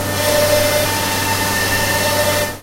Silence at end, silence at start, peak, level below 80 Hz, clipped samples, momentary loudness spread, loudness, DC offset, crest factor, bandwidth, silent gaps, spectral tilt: 0 s; 0 s; -2 dBFS; -36 dBFS; under 0.1%; 3 LU; -15 LUFS; under 0.1%; 16 dB; 16 kHz; none; -2.5 dB/octave